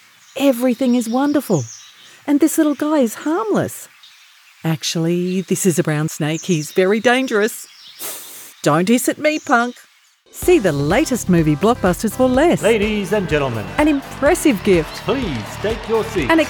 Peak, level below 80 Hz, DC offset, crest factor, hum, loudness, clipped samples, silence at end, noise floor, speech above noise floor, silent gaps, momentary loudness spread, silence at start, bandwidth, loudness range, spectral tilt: 0 dBFS; -40 dBFS; under 0.1%; 16 dB; none; -17 LUFS; under 0.1%; 0 s; -47 dBFS; 31 dB; none; 11 LU; 0.35 s; 19 kHz; 4 LU; -5 dB/octave